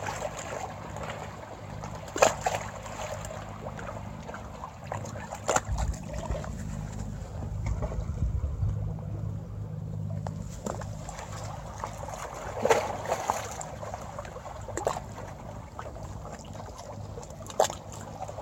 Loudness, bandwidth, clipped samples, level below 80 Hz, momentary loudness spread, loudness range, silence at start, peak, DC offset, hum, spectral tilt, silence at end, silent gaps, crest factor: -34 LUFS; 16.5 kHz; under 0.1%; -42 dBFS; 13 LU; 5 LU; 0 s; -4 dBFS; under 0.1%; none; -4.5 dB/octave; 0 s; none; 30 dB